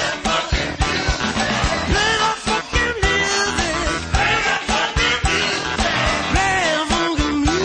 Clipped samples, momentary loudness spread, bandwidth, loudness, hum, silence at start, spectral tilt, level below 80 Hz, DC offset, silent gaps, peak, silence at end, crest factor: under 0.1%; 3 LU; 10 kHz; -18 LUFS; none; 0 s; -3 dB/octave; -28 dBFS; under 0.1%; none; -6 dBFS; 0 s; 14 dB